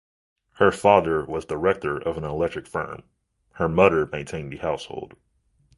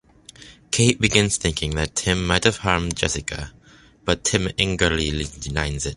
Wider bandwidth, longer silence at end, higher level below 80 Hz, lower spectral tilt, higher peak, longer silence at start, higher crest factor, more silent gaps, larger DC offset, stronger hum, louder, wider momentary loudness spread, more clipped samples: about the same, 11.5 kHz vs 11.5 kHz; first, 0.7 s vs 0 s; second, -48 dBFS vs -36 dBFS; first, -6.5 dB/octave vs -3.5 dB/octave; about the same, -2 dBFS vs 0 dBFS; first, 0.6 s vs 0.4 s; about the same, 22 dB vs 22 dB; neither; neither; neither; about the same, -23 LUFS vs -21 LUFS; first, 16 LU vs 9 LU; neither